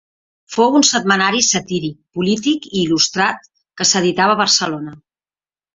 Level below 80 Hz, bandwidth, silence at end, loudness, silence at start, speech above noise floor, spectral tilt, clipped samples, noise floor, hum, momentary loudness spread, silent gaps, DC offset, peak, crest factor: -58 dBFS; 7.8 kHz; 0.8 s; -15 LUFS; 0.5 s; over 74 dB; -2.5 dB/octave; under 0.1%; under -90 dBFS; none; 12 LU; none; under 0.1%; 0 dBFS; 18 dB